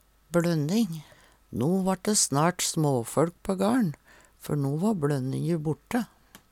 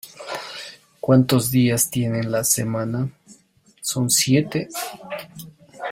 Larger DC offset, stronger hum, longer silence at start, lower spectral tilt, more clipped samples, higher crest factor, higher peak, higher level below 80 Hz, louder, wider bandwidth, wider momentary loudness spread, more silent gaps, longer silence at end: neither; neither; first, 0.3 s vs 0.05 s; about the same, -5 dB/octave vs -4.5 dB/octave; neither; about the same, 16 dB vs 20 dB; second, -10 dBFS vs -2 dBFS; about the same, -58 dBFS vs -56 dBFS; second, -27 LUFS vs -20 LUFS; about the same, 17 kHz vs 16.5 kHz; second, 8 LU vs 17 LU; neither; first, 0.15 s vs 0 s